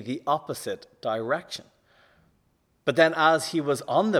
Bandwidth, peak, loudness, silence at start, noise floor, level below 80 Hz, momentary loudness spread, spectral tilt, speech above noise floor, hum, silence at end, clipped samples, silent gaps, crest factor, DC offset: 15.5 kHz; -6 dBFS; -25 LUFS; 0 s; -68 dBFS; -72 dBFS; 14 LU; -4.5 dB/octave; 43 dB; none; 0 s; under 0.1%; none; 20 dB; under 0.1%